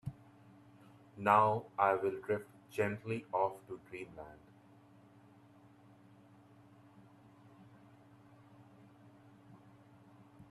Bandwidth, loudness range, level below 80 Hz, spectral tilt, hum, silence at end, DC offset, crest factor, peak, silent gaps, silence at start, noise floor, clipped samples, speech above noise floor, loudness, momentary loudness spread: 13.5 kHz; 21 LU; -76 dBFS; -7 dB/octave; none; 0.05 s; under 0.1%; 26 dB; -14 dBFS; none; 0.05 s; -62 dBFS; under 0.1%; 27 dB; -35 LUFS; 21 LU